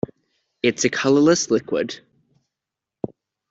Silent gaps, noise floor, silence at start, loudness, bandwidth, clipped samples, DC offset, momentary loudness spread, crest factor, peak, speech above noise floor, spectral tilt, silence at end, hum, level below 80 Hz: none; -86 dBFS; 0.65 s; -19 LUFS; 8 kHz; under 0.1%; under 0.1%; 18 LU; 18 dB; -4 dBFS; 67 dB; -4 dB/octave; 1.55 s; none; -62 dBFS